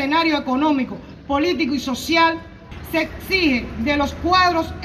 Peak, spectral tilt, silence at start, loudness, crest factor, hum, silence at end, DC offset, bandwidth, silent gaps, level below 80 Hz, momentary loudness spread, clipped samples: -4 dBFS; -4.5 dB/octave; 0 s; -19 LUFS; 16 dB; none; 0 s; under 0.1%; 15 kHz; none; -40 dBFS; 11 LU; under 0.1%